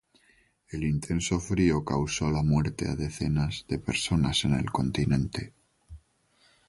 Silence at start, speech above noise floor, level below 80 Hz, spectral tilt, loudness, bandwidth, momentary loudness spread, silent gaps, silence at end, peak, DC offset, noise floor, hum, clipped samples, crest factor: 0.7 s; 39 dB; -42 dBFS; -5.5 dB/octave; -28 LUFS; 11.5 kHz; 8 LU; none; 0.7 s; -12 dBFS; under 0.1%; -66 dBFS; none; under 0.1%; 18 dB